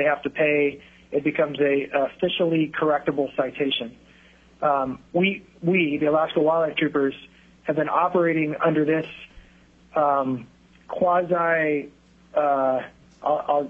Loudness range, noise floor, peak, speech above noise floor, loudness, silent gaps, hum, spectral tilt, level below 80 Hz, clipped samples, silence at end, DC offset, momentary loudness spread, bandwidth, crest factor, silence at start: 2 LU; -54 dBFS; -6 dBFS; 31 dB; -23 LUFS; none; none; -8 dB/octave; -60 dBFS; under 0.1%; 0 s; under 0.1%; 8 LU; 7.2 kHz; 16 dB; 0 s